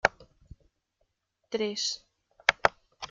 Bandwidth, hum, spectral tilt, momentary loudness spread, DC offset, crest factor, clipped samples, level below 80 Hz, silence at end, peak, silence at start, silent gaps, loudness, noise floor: 9.6 kHz; none; -2 dB/octave; 14 LU; under 0.1%; 30 dB; under 0.1%; -60 dBFS; 0.05 s; -2 dBFS; 0.05 s; none; -29 LUFS; -77 dBFS